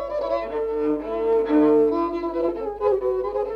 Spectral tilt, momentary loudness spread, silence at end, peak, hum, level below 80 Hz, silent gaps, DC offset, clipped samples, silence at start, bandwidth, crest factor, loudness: -8 dB/octave; 7 LU; 0 s; -8 dBFS; none; -48 dBFS; none; under 0.1%; under 0.1%; 0 s; 5.6 kHz; 14 dB; -22 LUFS